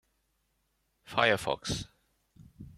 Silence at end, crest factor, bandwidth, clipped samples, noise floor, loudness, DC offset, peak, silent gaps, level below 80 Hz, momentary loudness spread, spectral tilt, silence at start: 0.05 s; 26 dB; 15 kHz; under 0.1%; -77 dBFS; -30 LUFS; under 0.1%; -10 dBFS; none; -58 dBFS; 11 LU; -3.5 dB/octave; 1.1 s